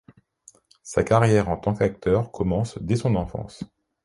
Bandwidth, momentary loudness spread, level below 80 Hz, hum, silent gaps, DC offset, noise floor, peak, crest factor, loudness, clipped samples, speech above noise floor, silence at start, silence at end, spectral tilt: 11.5 kHz; 15 LU; -44 dBFS; none; none; under 0.1%; -55 dBFS; -4 dBFS; 20 dB; -23 LUFS; under 0.1%; 33 dB; 0.85 s; 0.4 s; -7 dB/octave